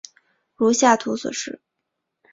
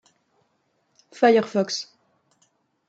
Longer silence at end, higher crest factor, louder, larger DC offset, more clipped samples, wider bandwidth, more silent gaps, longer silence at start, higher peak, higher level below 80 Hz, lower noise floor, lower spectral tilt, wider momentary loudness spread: second, 0.75 s vs 1.05 s; about the same, 20 dB vs 20 dB; about the same, -20 LUFS vs -21 LUFS; neither; neither; about the same, 7.8 kHz vs 8 kHz; neither; second, 0.6 s vs 1.2 s; first, -2 dBFS vs -6 dBFS; first, -66 dBFS vs -78 dBFS; first, -79 dBFS vs -70 dBFS; second, -3 dB/octave vs -4.5 dB/octave; first, 16 LU vs 13 LU